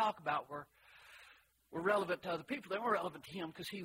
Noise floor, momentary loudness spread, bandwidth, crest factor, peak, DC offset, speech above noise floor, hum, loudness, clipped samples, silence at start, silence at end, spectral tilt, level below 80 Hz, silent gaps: -65 dBFS; 22 LU; 16 kHz; 20 dB; -20 dBFS; under 0.1%; 26 dB; none; -39 LUFS; under 0.1%; 0 s; 0 s; -5 dB/octave; -78 dBFS; none